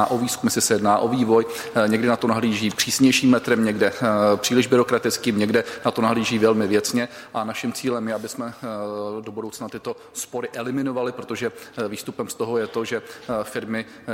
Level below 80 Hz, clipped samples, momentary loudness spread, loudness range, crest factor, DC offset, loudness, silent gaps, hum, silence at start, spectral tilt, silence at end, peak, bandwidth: -60 dBFS; under 0.1%; 12 LU; 10 LU; 18 dB; under 0.1%; -22 LUFS; none; none; 0 s; -4 dB/octave; 0 s; -4 dBFS; 16.5 kHz